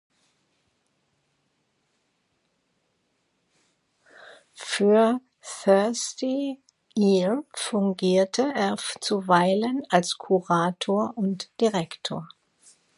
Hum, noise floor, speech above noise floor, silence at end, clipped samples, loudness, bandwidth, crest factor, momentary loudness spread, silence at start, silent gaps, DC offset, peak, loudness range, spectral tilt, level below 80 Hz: none; -73 dBFS; 49 dB; 0.7 s; under 0.1%; -24 LUFS; 11.5 kHz; 24 dB; 11 LU; 4.2 s; none; under 0.1%; -2 dBFS; 4 LU; -5 dB/octave; -76 dBFS